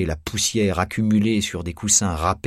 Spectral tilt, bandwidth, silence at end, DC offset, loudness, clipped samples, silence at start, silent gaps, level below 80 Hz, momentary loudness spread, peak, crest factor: -3.5 dB/octave; 16 kHz; 0.1 s; under 0.1%; -20 LUFS; under 0.1%; 0 s; none; -38 dBFS; 8 LU; -4 dBFS; 18 dB